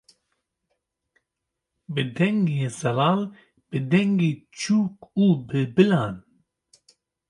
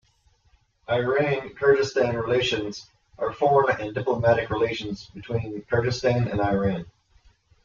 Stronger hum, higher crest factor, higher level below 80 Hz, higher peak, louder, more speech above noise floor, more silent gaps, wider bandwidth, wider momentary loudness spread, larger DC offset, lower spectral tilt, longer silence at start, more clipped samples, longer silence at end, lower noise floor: neither; about the same, 20 dB vs 18 dB; second, -64 dBFS vs -52 dBFS; about the same, -4 dBFS vs -6 dBFS; about the same, -23 LUFS vs -24 LUFS; first, 61 dB vs 40 dB; neither; first, 11.5 kHz vs 7.4 kHz; about the same, 11 LU vs 11 LU; neither; about the same, -6.5 dB/octave vs -6 dB/octave; first, 1.9 s vs 0.9 s; neither; first, 1.1 s vs 0.75 s; first, -83 dBFS vs -63 dBFS